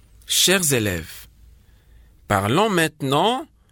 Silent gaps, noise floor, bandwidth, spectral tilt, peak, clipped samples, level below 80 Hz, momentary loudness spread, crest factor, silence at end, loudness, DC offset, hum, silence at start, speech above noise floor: none; -50 dBFS; 19.5 kHz; -3 dB/octave; -4 dBFS; under 0.1%; -48 dBFS; 13 LU; 18 dB; 0.25 s; -19 LUFS; under 0.1%; none; 0.3 s; 31 dB